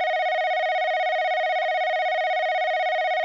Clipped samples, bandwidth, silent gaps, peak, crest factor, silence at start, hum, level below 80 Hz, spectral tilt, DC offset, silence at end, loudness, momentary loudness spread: under 0.1%; 7.2 kHz; none; -18 dBFS; 6 dB; 0 s; none; under -90 dBFS; 3 dB/octave; under 0.1%; 0 s; -23 LUFS; 0 LU